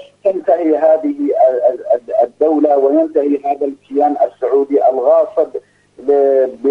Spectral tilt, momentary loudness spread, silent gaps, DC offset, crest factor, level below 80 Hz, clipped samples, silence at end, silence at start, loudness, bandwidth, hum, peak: -7.5 dB/octave; 7 LU; none; under 0.1%; 12 dB; -66 dBFS; under 0.1%; 0 s; 0 s; -14 LUFS; 4.2 kHz; 50 Hz at -60 dBFS; 0 dBFS